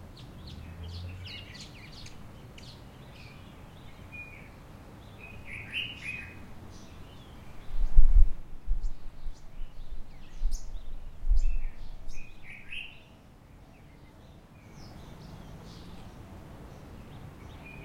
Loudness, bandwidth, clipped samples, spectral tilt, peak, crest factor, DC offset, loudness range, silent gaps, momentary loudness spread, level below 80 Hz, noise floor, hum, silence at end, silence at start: -39 LUFS; 7 kHz; under 0.1%; -5 dB/octave; -4 dBFS; 24 dB; under 0.1%; 14 LU; none; 17 LU; -32 dBFS; -53 dBFS; none; 0 s; 0.05 s